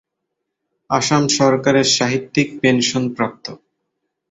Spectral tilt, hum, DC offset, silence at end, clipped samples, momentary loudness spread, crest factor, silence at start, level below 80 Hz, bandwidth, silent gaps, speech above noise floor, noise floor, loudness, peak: -4 dB/octave; none; under 0.1%; 0.75 s; under 0.1%; 9 LU; 18 dB; 0.9 s; -56 dBFS; 8.2 kHz; none; 61 dB; -77 dBFS; -16 LUFS; -2 dBFS